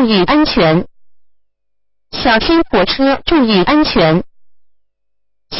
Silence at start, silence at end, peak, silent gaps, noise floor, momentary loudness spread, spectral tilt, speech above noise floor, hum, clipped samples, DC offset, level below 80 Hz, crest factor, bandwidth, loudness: 0 s; 0 s; 0 dBFS; none; -73 dBFS; 7 LU; -9 dB/octave; 62 dB; none; under 0.1%; under 0.1%; -36 dBFS; 14 dB; 5.8 kHz; -12 LUFS